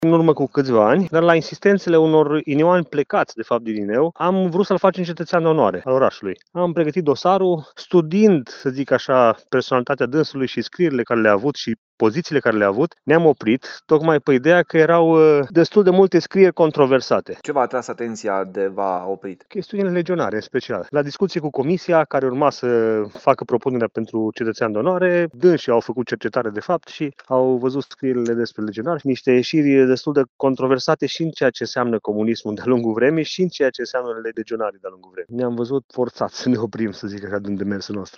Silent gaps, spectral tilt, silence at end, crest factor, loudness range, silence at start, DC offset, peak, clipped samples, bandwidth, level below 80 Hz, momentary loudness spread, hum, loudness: 11.78-11.98 s, 30.29-30.39 s, 35.84-35.89 s; -7 dB/octave; 0.1 s; 18 dB; 7 LU; 0 s; under 0.1%; 0 dBFS; under 0.1%; 7.8 kHz; -64 dBFS; 10 LU; none; -19 LUFS